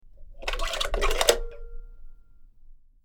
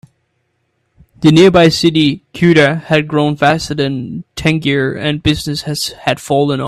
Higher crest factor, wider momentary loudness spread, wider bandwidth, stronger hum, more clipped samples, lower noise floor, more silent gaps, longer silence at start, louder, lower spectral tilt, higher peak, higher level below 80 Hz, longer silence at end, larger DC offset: first, 28 dB vs 14 dB; first, 22 LU vs 10 LU; first, over 20 kHz vs 14 kHz; neither; neither; second, -49 dBFS vs -65 dBFS; neither; second, 0.05 s vs 1.2 s; second, -26 LUFS vs -13 LUFS; second, -1.5 dB/octave vs -5.5 dB/octave; about the same, 0 dBFS vs 0 dBFS; first, -34 dBFS vs -40 dBFS; first, 0.3 s vs 0 s; neither